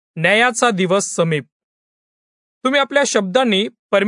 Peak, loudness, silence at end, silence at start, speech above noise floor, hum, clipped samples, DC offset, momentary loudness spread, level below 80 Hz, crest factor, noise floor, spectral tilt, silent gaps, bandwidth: 0 dBFS; -16 LUFS; 0 s; 0.15 s; over 74 dB; none; under 0.1%; under 0.1%; 6 LU; -66 dBFS; 16 dB; under -90 dBFS; -3.5 dB/octave; 1.52-2.61 s, 3.79-3.89 s; 11 kHz